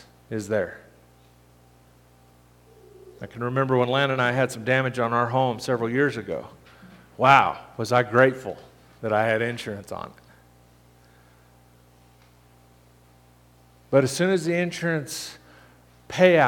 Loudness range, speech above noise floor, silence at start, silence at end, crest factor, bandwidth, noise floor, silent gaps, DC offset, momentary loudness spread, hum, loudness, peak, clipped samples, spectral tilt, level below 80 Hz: 12 LU; 33 dB; 0.3 s; 0 s; 26 dB; 18 kHz; -55 dBFS; none; under 0.1%; 17 LU; 60 Hz at -50 dBFS; -23 LUFS; 0 dBFS; under 0.1%; -5.5 dB/octave; -62 dBFS